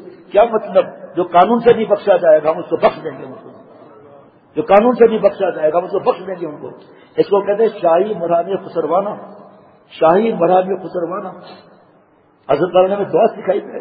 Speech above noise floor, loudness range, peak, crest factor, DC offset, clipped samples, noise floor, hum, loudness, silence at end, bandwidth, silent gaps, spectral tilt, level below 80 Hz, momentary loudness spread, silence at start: 37 dB; 3 LU; 0 dBFS; 16 dB; under 0.1%; under 0.1%; -52 dBFS; none; -15 LUFS; 0 s; 5 kHz; none; -9.5 dB/octave; -56 dBFS; 14 LU; 0 s